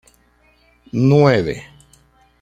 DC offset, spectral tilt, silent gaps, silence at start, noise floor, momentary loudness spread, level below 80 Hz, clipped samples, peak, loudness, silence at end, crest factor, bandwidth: under 0.1%; -8 dB/octave; none; 0.95 s; -56 dBFS; 15 LU; -48 dBFS; under 0.1%; -2 dBFS; -16 LUFS; 0.8 s; 18 dB; 9.2 kHz